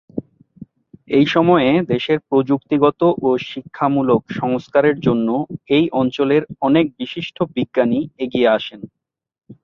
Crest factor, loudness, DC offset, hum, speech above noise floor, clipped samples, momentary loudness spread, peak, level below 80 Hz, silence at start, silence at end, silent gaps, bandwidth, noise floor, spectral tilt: 16 dB; -17 LUFS; under 0.1%; none; 25 dB; under 0.1%; 9 LU; 0 dBFS; -56 dBFS; 0.15 s; 0.1 s; none; 6.8 kHz; -42 dBFS; -8 dB/octave